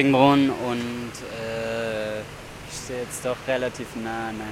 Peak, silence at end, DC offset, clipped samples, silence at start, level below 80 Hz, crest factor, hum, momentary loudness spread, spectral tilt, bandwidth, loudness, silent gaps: -4 dBFS; 0 s; under 0.1%; under 0.1%; 0 s; -52 dBFS; 22 dB; none; 16 LU; -5 dB/octave; 15.5 kHz; -26 LUFS; none